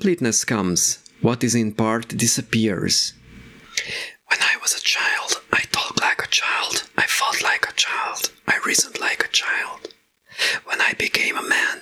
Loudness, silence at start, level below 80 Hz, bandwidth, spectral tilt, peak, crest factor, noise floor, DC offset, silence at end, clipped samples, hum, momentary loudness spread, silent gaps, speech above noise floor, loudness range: -20 LUFS; 0 s; -58 dBFS; 20 kHz; -2 dB/octave; 0 dBFS; 22 dB; -49 dBFS; under 0.1%; 0 s; under 0.1%; none; 6 LU; none; 27 dB; 2 LU